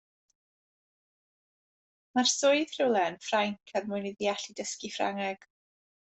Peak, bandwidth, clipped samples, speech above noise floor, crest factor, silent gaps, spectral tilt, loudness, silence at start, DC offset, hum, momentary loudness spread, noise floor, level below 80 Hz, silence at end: -14 dBFS; 8.4 kHz; under 0.1%; over 60 dB; 18 dB; none; -2.5 dB/octave; -30 LUFS; 2.15 s; under 0.1%; none; 11 LU; under -90 dBFS; -78 dBFS; 0.65 s